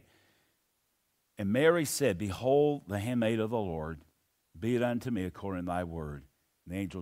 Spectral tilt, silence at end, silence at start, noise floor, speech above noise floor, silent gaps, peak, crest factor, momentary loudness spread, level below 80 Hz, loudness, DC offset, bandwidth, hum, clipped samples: -5.5 dB/octave; 0 s; 1.4 s; -77 dBFS; 46 dB; none; -12 dBFS; 22 dB; 15 LU; -58 dBFS; -31 LUFS; under 0.1%; 16 kHz; none; under 0.1%